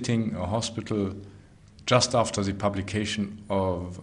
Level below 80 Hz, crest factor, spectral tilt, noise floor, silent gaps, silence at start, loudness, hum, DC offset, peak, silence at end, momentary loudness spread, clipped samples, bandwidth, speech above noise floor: -54 dBFS; 20 dB; -5 dB/octave; -51 dBFS; none; 0 s; -27 LUFS; none; under 0.1%; -8 dBFS; 0 s; 9 LU; under 0.1%; 10.5 kHz; 24 dB